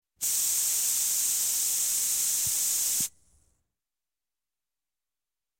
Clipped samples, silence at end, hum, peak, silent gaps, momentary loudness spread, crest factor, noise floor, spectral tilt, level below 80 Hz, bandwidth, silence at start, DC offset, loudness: under 0.1%; 2.5 s; none; -14 dBFS; none; 2 LU; 16 dB; under -90 dBFS; 2 dB/octave; -70 dBFS; 17.5 kHz; 0.2 s; under 0.1%; -24 LUFS